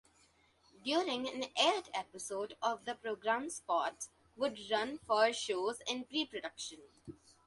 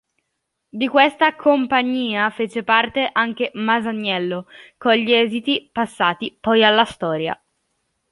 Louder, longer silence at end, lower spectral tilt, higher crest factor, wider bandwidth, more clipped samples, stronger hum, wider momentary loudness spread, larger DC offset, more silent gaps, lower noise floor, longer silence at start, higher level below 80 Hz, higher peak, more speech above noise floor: second, -36 LUFS vs -18 LUFS; second, 0.3 s vs 0.75 s; second, -2 dB/octave vs -5 dB/octave; about the same, 22 dB vs 18 dB; about the same, 11.5 kHz vs 11.5 kHz; neither; neither; first, 14 LU vs 10 LU; neither; neither; second, -70 dBFS vs -76 dBFS; about the same, 0.85 s vs 0.75 s; second, -76 dBFS vs -60 dBFS; second, -16 dBFS vs -2 dBFS; second, 33 dB vs 57 dB